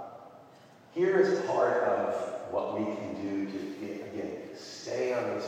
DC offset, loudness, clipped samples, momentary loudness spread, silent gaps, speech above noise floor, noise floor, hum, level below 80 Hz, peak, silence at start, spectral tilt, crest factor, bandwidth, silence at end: under 0.1%; -31 LUFS; under 0.1%; 15 LU; none; 25 dB; -55 dBFS; none; -76 dBFS; -12 dBFS; 0 s; -5.5 dB/octave; 20 dB; 9.2 kHz; 0 s